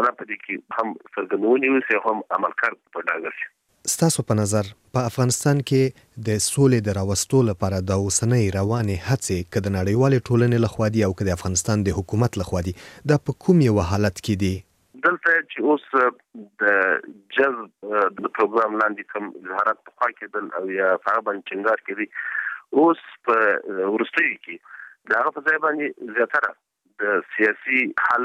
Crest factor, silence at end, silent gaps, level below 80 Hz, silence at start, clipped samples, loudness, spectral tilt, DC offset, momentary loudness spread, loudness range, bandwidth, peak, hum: 16 dB; 0 s; none; -50 dBFS; 0 s; under 0.1%; -22 LUFS; -5 dB/octave; under 0.1%; 9 LU; 2 LU; 15.5 kHz; -6 dBFS; none